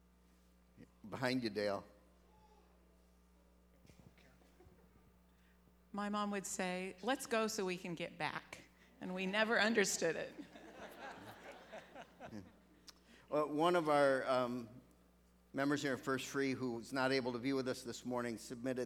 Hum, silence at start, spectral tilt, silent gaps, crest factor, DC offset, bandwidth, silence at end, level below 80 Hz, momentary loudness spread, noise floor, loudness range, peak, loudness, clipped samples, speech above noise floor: none; 0.8 s; -4 dB/octave; none; 22 dB; under 0.1%; 19.5 kHz; 0 s; -72 dBFS; 22 LU; -69 dBFS; 10 LU; -18 dBFS; -38 LUFS; under 0.1%; 31 dB